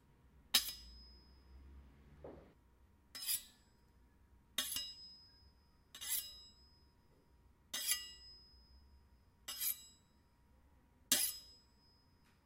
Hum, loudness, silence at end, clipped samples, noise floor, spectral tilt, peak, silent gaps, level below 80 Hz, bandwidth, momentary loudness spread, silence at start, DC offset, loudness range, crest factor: none; -39 LUFS; 0.9 s; under 0.1%; -71 dBFS; 0.5 dB/octave; -12 dBFS; none; -68 dBFS; 16 kHz; 26 LU; 0.25 s; under 0.1%; 6 LU; 34 dB